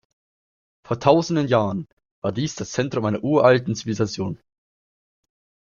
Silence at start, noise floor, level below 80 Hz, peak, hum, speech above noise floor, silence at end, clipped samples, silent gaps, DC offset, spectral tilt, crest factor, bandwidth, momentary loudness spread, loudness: 0.9 s; under -90 dBFS; -58 dBFS; -2 dBFS; none; over 69 dB; 1.3 s; under 0.1%; 1.93-1.97 s, 2.11-2.22 s; under 0.1%; -6 dB/octave; 22 dB; 7.4 kHz; 13 LU; -22 LUFS